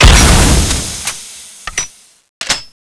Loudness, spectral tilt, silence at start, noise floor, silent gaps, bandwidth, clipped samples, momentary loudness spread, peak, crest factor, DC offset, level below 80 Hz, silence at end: -12 LUFS; -3 dB/octave; 0 s; -32 dBFS; 2.29-2.41 s; 11 kHz; 0.8%; 19 LU; 0 dBFS; 12 dB; under 0.1%; -16 dBFS; 0.25 s